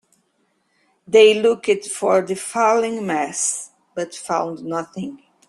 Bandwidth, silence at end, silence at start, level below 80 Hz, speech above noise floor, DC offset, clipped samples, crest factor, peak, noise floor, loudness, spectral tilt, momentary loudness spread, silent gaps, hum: 12.5 kHz; 0.3 s; 1.1 s; -68 dBFS; 48 dB; under 0.1%; under 0.1%; 18 dB; -2 dBFS; -67 dBFS; -19 LUFS; -3 dB/octave; 16 LU; none; none